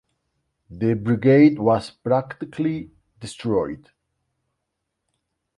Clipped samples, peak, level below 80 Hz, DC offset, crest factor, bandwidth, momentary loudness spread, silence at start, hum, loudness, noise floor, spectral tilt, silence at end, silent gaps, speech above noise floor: under 0.1%; -4 dBFS; -56 dBFS; under 0.1%; 20 dB; 11.5 kHz; 19 LU; 0.7 s; none; -20 LUFS; -79 dBFS; -8 dB/octave; 1.8 s; none; 59 dB